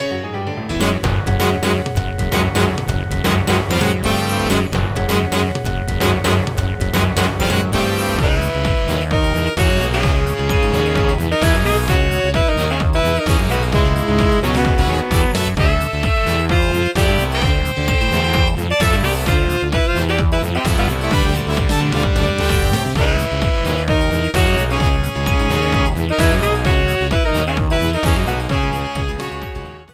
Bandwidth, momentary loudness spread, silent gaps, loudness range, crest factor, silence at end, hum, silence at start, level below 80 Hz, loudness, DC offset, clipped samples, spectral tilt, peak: 16.5 kHz; 4 LU; none; 2 LU; 14 dB; 0.1 s; none; 0 s; -22 dBFS; -17 LUFS; under 0.1%; under 0.1%; -5.5 dB/octave; -2 dBFS